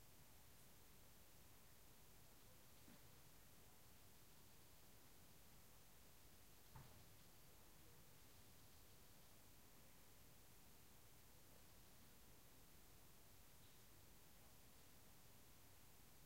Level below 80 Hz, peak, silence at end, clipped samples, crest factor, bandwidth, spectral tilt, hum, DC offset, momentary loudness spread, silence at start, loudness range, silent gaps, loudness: -78 dBFS; -48 dBFS; 0 s; under 0.1%; 22 dB; 16 kHz; -3 dB/octave; none; under 0.1%; 1 LU; 0 s; 1 LU; none; -68 LUFS